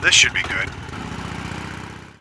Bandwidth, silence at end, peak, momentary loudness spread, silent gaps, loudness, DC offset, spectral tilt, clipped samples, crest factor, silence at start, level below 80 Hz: 11 kHz; 0.1 s; 0 dBFS; 20 LU; none; -20 LUFS; under 0.1%; -1 dB/octave; under 0.1%; 22 dB; 0 s; -42 dBFS